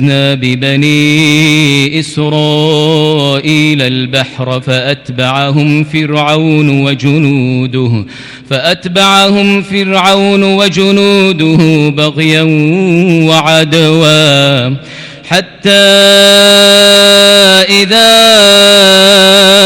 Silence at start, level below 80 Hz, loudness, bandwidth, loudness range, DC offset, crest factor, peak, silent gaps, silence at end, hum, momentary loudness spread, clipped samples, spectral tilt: 0 s; -46 dBFS; -6 LUFS; 19.5 kHz; 8 LU; under 0.1%; 6 dB; 0 dBFS; none; 0 s; none; 10 LU; 0.4%; -4 dB/octave